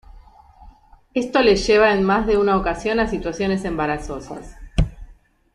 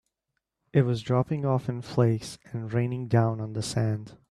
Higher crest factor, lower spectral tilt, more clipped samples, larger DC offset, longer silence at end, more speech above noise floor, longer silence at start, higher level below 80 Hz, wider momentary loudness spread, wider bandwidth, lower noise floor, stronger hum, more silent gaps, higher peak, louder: about the same, 18 dB vs 18 dB; second, -5.5 dB/octave vs -7 dB/octave; neither; neither; first, 0.45 s vs 0.15 s; second, 29 dB vs 56 dB; second, 0.6 s vs 0.75 s; first, -34 dBFS vs -60 dBFS; first, 13 LU vs 7 LU; about the same, 11 kHz vs 12 kHz; second, -48 dBFS vs -82 dBFS; neither; neither; first, -4 dBFS vs -10 dBFS; first, -19 LUFS vs -28 LUFS